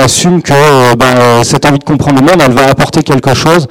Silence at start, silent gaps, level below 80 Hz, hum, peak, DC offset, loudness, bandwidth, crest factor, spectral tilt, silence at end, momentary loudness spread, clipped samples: 0 s; none; -32 dBFS; none; 0 dBFS; under 0.1%; -6 LUFS; 17 kHz; 6 dB; -5 dB/octave; 0.05 s; 4 LU; under 0.1%